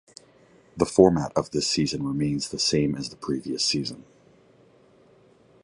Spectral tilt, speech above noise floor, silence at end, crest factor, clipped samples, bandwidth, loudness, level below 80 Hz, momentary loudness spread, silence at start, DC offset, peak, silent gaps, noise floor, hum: -4.5 dB/octave; 33 dB; 1.65 s; 24 dB; under 0.1%; 11.5 kHz; -24 LUFS; -52 dBFS; 12 LU; 0.75 s; under 0.1%; -2 dBFS; none; -57 dBFS; none